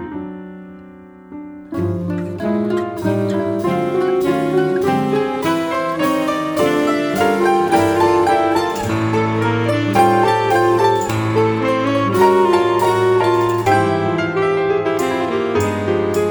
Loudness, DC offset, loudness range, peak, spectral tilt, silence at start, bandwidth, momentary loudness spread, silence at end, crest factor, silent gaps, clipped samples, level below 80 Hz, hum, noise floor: -16 LUFS; under 0.1%; 5 LU; -2 dBFS; -6 dB/octave; 0 s; over 20 kHz; 8 LU; 0 s; 16 dB; none; under 0.1%; -50 dBFS; none; -39 dBFS